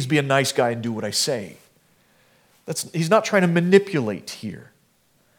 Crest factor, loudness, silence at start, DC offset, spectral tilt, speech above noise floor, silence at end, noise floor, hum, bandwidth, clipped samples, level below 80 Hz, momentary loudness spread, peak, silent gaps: 22 dB; -21 LUFS; 0 s; under 0.1%; -4.5 dB/octave; 41 dB; 0.75 s; -62 dBFS; none; 18 kHz; under 0.1%; -72 dBFS; 17 LU; -2 dBFS; none